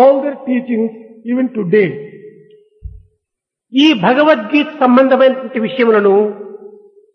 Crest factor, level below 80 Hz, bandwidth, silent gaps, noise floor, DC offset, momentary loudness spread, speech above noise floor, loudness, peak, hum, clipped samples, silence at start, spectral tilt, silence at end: 14 dB; -48 dBFS; 6.6 kHz; none; -80 dBFS; under 0.1%; 12 LU; 68 dB; -13 LUFS; 0 dBFS; none; under 0.1%; 0 s; -6.5 dB/octave; 0.45 s